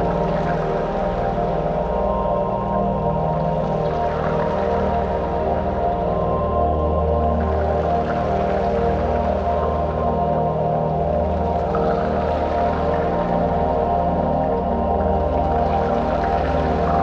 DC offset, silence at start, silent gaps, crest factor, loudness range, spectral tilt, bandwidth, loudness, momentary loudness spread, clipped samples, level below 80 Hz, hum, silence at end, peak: under 0.1%; 0 s; none; 12 dB; 1 LU; -9 dB/octave; 7 kHz; -20 LUFS; 2 LU; under 0.1%; -30 dBFS; none; 0 s; -6 dBFS